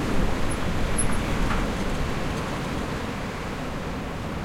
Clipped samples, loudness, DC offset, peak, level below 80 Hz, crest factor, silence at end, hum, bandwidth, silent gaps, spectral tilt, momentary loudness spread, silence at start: under 0.1%; -28 LUFS; under 0.1%; -10 dBFS; -32 dBFS; 16 dB; 0 s; none; 15.5 kHz; none; -5 dB/octave; 6 LU; 0 s